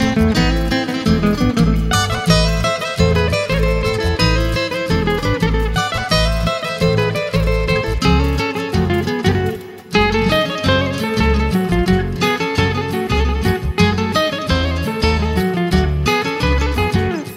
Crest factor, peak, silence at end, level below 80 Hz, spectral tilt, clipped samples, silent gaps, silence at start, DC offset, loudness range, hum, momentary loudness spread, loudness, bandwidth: 16 dB; 0 dBFS; 0 s; -24 dBFS; -5.5 dB/octave; under 0.1%; none; 0 s; under 0.1%; 1 LU; none; 4 LU; -17 LUFS; 16 kHz